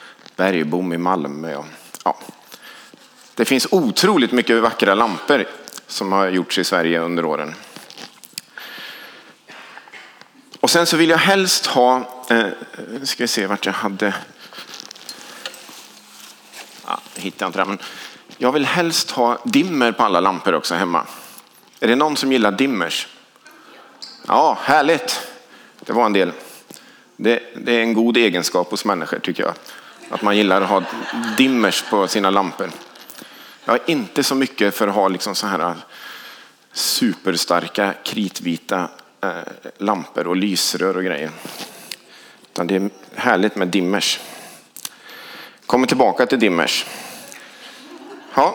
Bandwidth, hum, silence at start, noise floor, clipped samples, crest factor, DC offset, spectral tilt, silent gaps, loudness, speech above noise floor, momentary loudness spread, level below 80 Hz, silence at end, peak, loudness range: over 20 kHz; none; 0 s; -47 dBFS; under 0.1%; 20 dB; under 0.1%; -3.5 dB/octave; none; -18 LUFS; 28 dB; 22 LU; -70 dBFS; 0 s; 0 dBFS; 7 LU